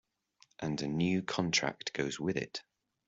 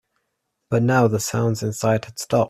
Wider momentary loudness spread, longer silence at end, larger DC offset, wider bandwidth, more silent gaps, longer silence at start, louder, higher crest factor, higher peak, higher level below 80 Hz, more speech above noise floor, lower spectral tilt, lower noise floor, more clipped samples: first, 10 LU vs 6 LU; first, 0.45 s vs 0 s; neither; second, 8 kHz vs 14.5 kHz; neither; about the same, 0.6 s vs 0.7 s; second, -34 LUFS vs -21 LUFS; about the same, 22 dB vs 18 dB; second, -14 dBFS vs -4 dBFS; second, -68 dBFS vs -56 dBFS; second, 35 dB vs 56 dB; second, -4 dB/octave vs -6 dB/octave; second, -69 dBFS vs -76 dBFS; neither